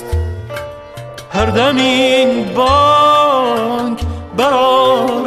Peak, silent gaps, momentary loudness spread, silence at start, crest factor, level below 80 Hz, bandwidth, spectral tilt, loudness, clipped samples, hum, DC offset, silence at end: -2 dBFS; none; 17 LU; 0 s; 12 dB; -30 dBFS; 14 kHz; -5 dB/octave; -12 LUFS; under 0.1%; none; under 0.1%; 0 s